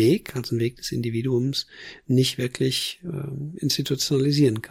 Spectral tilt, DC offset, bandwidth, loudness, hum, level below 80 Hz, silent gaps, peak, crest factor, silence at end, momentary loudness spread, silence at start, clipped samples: -5.5 dB/octave; under 0.1%; 16.5 kHz; -24 LUFS; none; -56 dBFS; none; -8 dBFS; 14 dB; 0.05 s; 11 LU; 0 s; under 0.1%